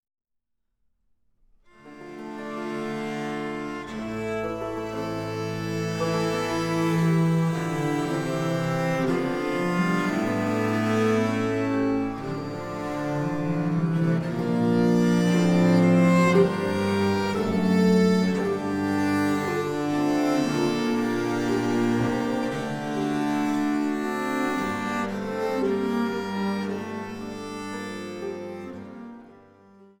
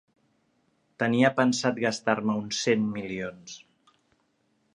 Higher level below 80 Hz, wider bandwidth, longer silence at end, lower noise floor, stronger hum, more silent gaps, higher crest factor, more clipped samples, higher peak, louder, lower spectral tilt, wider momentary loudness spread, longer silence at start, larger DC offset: first, -56 dBFS vs -68 dBFS; first, 17 kHz vs 10.5 kHz; second, 0.15 s vs 1.15 s; first, -77 dBFS vs -71 dBFS; neither; neither; second, 16 dB vs 22 dB; neither; about the same, -8 dBFS vs -6 dBFS; about the same, -25 LUFS vs -26 LUFS; first, -6.5 dB/octave vs -4.5 dB/octave; second, 13 LU vs 16 LU; first, 1.85 s vs 1 s; neither